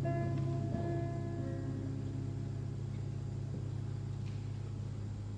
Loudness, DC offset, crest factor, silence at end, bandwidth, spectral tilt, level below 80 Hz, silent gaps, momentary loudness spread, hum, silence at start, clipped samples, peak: -40 LUFS; under 0.1%; 16 dB; 0 s; 9.4 kHz; -8.5 dB/octave; -52 dBFS; none; 6 LU; none; 0 s; under 0.1%; -22 dBFS